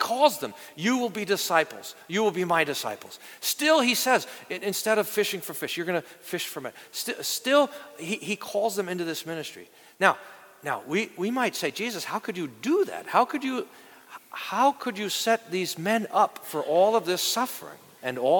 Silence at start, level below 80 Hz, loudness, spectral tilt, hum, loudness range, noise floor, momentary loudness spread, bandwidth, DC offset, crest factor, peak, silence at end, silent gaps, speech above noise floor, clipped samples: 0 s; -80 dBFS; -26 LUFS; -3 dB/octave; none; 4 LU; -48 dBFS; 13 LU; 19 kHz; under 0.1%; 24 dB; -2 dBFS; 0 s; none; 21 dB; under 0.1%